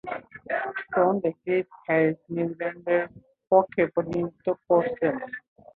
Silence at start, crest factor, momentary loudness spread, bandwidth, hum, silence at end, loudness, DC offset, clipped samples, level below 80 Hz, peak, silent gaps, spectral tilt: 0.05 s; 20 dB; 11 LU; 4.4 kHz; none; 0.35 s; -26 LUFS; under 0.1%; under 0.1%; -64 dBFS; -6 dBFS; none; -9.5 dB/octave